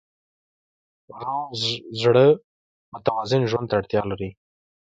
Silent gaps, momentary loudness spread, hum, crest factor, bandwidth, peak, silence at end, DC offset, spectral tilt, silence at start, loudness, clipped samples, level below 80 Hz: 2.44-2.92 s; 15 LU; none; 20 dB; 8.8 kHz; -4 dBFS; 0.55 s; under 0.1%; -6 dB/octave; 1.1 s; -22 LUFS; under 0.1%; -56 dBFS